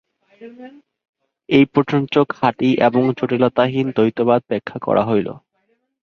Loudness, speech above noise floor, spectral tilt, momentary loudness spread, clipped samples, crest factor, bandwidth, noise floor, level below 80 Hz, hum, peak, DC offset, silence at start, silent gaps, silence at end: -17 LUFS; 49 dB; -8 dB/octave; 8 LU; under 0.1%; 18 dB; 6.6 kHz; -66 dBFS; -58 dBFS; none; 0 dBFS; under 0.1%; 0.4 s; 1.09-1.13 s; 0.65 s